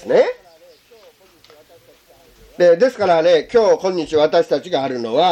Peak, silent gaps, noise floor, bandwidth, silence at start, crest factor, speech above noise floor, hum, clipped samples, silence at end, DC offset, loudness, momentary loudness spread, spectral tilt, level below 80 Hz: -2 dBFS; none; -50 dBFS; 8.8 kHz; 0.05 s; 14 dB; 35 dB; none; under 0.1%; 0 s; under 0.1%; -16 LUFS; 7 LU; -5 dB/octave; -56 dBFS